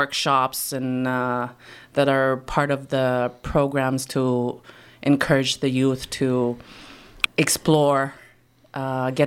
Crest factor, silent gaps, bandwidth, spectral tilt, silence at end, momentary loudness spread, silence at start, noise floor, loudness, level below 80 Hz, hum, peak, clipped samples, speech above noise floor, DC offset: 20 dB; none; 16.5 kHz; -5 dB/octave; 0 s; 11 LU; 0 s; -55 dBFS; -22 LUFS; -48 dBFS; none; -4 dBFS; under 0.1%; 33 dB; under 0.1%